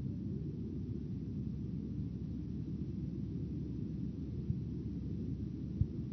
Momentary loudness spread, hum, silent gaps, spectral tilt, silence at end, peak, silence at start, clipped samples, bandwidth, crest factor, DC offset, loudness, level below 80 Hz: 2 LU; none; none; -11.5 dB/octave; 0 s; -20 dBFS; 0 s; under 0.1%; 6.2 kHz; 20 dB; under 0.1%; -41 LUFS; -50 dBFS